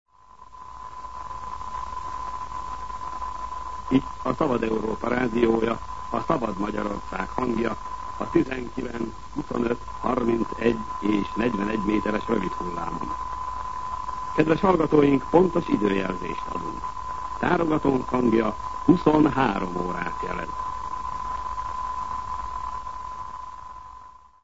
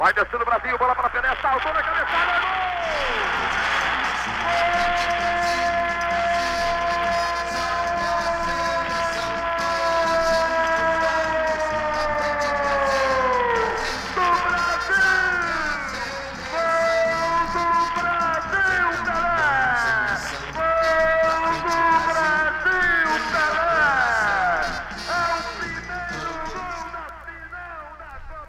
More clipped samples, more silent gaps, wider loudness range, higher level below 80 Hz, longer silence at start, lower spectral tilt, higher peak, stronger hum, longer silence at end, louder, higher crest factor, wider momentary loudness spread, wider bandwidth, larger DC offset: neither; neither; first, 8 LU vs 3 LU; about the same, -44 dBFS vs -42 dBFS; about the same, 0.05 s vs 0 s; first, -7 dB/octave vs -3 dB/octave; first, -4 dBFS vs -8 dBFS; neither; about the same, 0 s vs 0 s; second, -26 LUFS vs -21 LUFS; first, 22 dB vs 14 dB; first, 14 LU vs 10 LU; second, 8 kHz vs 15.5 kHz; first, 1% vs under 0.1%